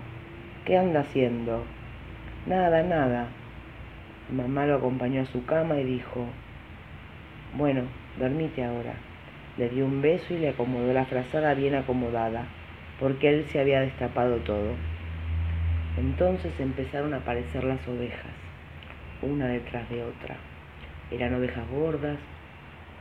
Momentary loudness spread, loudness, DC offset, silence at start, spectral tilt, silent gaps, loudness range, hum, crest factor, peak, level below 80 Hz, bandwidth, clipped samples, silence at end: 20 LU; -28 LUFS; under 0.1%; 0 s; -9 dB/octave; none; 6 LU; none; 20 dB; -8 dBFS; -46 dBFS; 6.2 kHz; under 0.1%; 0 s